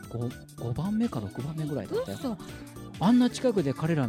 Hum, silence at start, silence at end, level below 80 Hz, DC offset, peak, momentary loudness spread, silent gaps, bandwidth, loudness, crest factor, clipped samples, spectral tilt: none; 0 s; 0 s; -54 dBFS; under 0.1%; -14 dBFS; 16 LU; none; 15.5 kHz; -29 LUFS; 16 dB; under 0.1%; -7 dB/octave